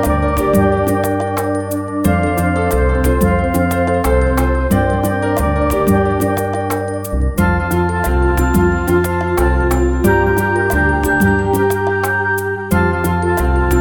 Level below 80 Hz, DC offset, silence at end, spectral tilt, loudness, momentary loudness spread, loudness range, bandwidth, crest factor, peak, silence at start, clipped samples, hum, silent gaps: -22 dBFS; under 0.1%; 0 s; -7 dB/octave; -15 LUFS; 4 LU; 2 LU; 19 kHz; 12 dB; -2 dBFS; 0 s; under 0.1%; none; none